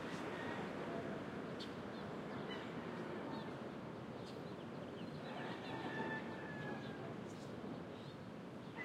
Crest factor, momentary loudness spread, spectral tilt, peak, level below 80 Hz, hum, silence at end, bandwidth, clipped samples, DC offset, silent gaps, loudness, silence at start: 16 dB; 5 LU; -6 dB/octave; -30 dBFS; -76 dBFS; none; 0 s; 15.5 kHz; under 0.1%; under 0.1%; none; -47 LUFS; 0 s